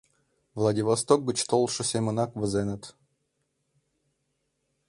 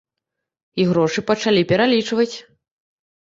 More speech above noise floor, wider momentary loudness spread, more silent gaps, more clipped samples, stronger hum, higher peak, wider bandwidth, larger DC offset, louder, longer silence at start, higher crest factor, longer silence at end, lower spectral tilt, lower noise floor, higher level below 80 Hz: second, 51 dB vs 64 dB; about the same, 8 LU vs 8 LU; neither; neither; neither; about the same, -6 dBFS vs -4 dBFS; first, 11.5 kHz vs 7.8 kHz; neither; second, -26 LUFS vs -18 LUFS; second, 0.55 s vs 0.75 s; first, 24 dB vs 16 dB; first, 2 s vs 0.8 s; about the same, -5 dB/octave vs -5.5 dB/octave; second, -77 dBFS vs -82 dBFS; about the same, -60 dBFS vs -58 dBFS